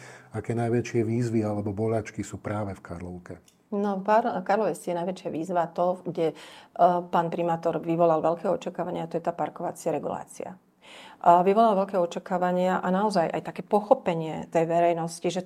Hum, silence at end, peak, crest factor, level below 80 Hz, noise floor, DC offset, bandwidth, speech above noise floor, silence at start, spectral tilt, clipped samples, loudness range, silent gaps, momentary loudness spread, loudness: none; 0 s; -4 dBFS; 22 dB; -68 dBFS; -49 dBFS; under 0.1%; 14.5 kHz; 23 dB; 0 s; -7 dB/octave; under 0.1%; 5 LU; none; 14 LU; -26 LUFS